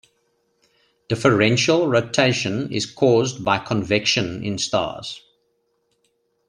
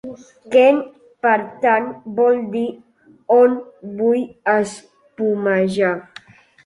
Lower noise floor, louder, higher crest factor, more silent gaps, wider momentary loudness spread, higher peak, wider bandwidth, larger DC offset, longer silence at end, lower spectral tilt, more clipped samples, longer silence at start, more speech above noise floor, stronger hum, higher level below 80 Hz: first, -69 dBFS vs -44 dBFS; about the same, -20 LUFS vs -18 LUFS; about the same, 20 dB vs 16 dB; neither; about the same, 11 LU vs 13 LU; about the same, -2 dBFS vs -2 dBFS; about the same, 11 kHz vs 11 kHz; neither; first, 1.3 s vs 0.65 s; second, -4.5 dB/octave vs -6 dB/octave; neither; first, 1.1 s vs 0.05 s; first, 49 dB vs 27 dB; neither; first, -56 dBFS vs -64 dBFS